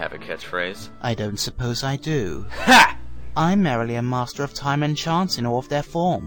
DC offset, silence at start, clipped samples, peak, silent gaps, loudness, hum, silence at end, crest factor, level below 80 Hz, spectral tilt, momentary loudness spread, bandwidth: under 0.1%; 0 s; under 0.1%; -2 dBFS; none; -21 LUFS; none; 0 s; 20 dB; -42 dBFS; -4.5 dB/octave; 16 LU; 17.5 kHz